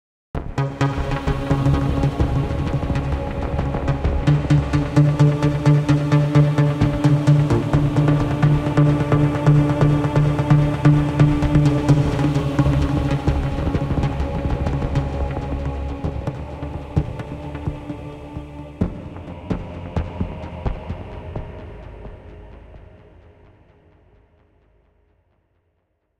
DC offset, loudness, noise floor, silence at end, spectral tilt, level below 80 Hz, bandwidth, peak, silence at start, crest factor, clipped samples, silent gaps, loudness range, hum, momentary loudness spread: under 0.1%; -19 LUFS; -69 dBFS; 3.4 s; -8.5 dB/octave; -30 dBFS; 9 kHz; -2 dBFS; 0.35 s; 16 dB; under 0.1%; none; 13 LU; none; 16 LU